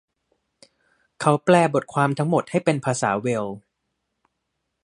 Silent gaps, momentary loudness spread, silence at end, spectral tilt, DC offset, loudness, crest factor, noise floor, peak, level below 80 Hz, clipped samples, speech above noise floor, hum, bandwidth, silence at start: none; 9 LU; 1.25 s; -6 dB/octave; under 0.1%; -21 LUFS; 22 dB; -78 dBFS; -2 dBFS; -66 dBFS; under 0.1%; 57 dB; none; 11.5 kHz; 1.2 s